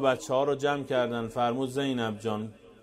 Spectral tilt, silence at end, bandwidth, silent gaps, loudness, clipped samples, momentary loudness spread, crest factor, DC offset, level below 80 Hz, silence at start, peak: -5.5 dB/octave; 0.1 s; 15.5 kHz; none; -29 LUFS; under 0.1%; 7 LU; 18 dB; under 0.1%; -62 dBFS; 0 s; -12 dBFS